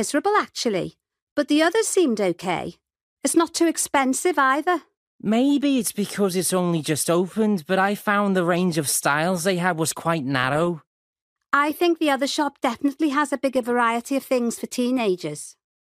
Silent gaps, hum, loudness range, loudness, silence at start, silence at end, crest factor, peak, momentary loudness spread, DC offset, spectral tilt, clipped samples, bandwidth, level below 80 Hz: 1.22-1.36 s, 3.01-3.17 s, 4.97-5.19 s, 10.87-11.13 s, 11.21-11.36 s; none; 2 LU; -22 LUFS; 0 s; 0.45 s; 18 dB; -4 dBFS; 7 LU; under 0.1%; -4 dB/octave; under 0.1%; 15.5 kHz; -64 dBFS